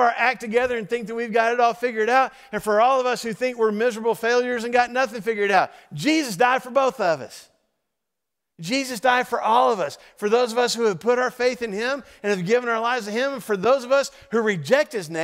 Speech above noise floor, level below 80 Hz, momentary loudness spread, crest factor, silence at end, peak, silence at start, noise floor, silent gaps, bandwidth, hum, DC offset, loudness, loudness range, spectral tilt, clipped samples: 62 dB; -64 dBFS; 7 LU; 18 dB; 0 s; -4 dBFS; 0 s; -84 dBFS; none; 16 kHz; none; under 0.1%; -22 LUFS; 3 LU; -4 dB/octave; under 0.1%